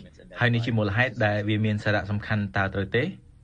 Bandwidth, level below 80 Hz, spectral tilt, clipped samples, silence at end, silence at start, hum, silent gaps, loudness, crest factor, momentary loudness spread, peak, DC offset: 7.6 kHz; -50 dBFS; -7.5 dB/octave; under 0.1%; 0.3 s; 0 s; none; none; -25 LUFS; 18 dB; 4 LU; -8 dBFS; under 0.1%